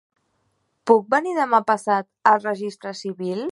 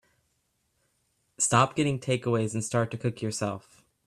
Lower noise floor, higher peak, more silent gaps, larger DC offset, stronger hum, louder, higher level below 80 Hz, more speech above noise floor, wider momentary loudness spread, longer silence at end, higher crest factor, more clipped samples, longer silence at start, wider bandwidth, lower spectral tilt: second, -70 dBFS vs -75 dBFS; first, -2 dBFS vs -8 dBFS; neither; neither; neither; first, -21 LUFS vs -27 LUFS; second, -76 dBFS vs -64 dBFS; about the same, 49 dB vs 47 dB; first, 13 LU vs 9 LU; second, 0 s vs 0.5 s; about the same, 20 dB vs 22 dB; neither; second, 0.85 s vs 1.4 s; second, 11.5 kHz vs 13.5 kHz; about the same, -5.5 dB/octave vs -4.5 dB/octave